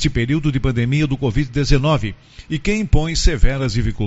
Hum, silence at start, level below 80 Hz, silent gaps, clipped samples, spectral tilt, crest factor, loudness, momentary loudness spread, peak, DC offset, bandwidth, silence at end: none; 0 s; -22 dBFS; none; under 0.1%; -6 dB/octave; 16 dB; -19 LUFS; 5 LU; 0 dBFS; under 0.1%; 8 kHz; 0 s